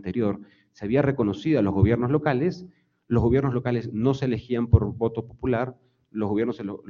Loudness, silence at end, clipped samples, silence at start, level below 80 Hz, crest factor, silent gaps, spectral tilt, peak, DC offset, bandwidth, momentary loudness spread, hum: -24 LUFS; 0.1 s; under 0.1%; 0.05 s; -42 dBFS; 20 dB; none; -9.5 dB/octave; -4 dBFS; under 0.1%; 7 kHz; 9 LU; none